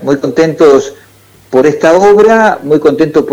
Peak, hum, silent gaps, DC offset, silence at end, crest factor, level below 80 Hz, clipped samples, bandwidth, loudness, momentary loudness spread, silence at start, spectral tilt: 0 dBFS; none; none; under 0.1%; 0 s; 8 dB; -46 dBFS; 0.6%; 13 kHz; -8 LUFS; 7 LU; 0 s; -6 dB/octave